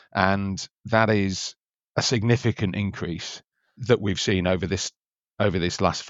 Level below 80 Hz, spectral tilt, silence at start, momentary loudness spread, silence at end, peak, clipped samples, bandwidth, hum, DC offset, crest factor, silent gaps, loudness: -56 dBFS; -5 dB/octave; 0.15 s; 11 LU; 0 s; -2 dBFS; under 0.1%; 8 kHz; none; under 0.1%; 22 dB; 0.72-0.76 s, 1.65-1.70 s, 1.84-1.94 s, 4.96-5.05 s; -24 LUFS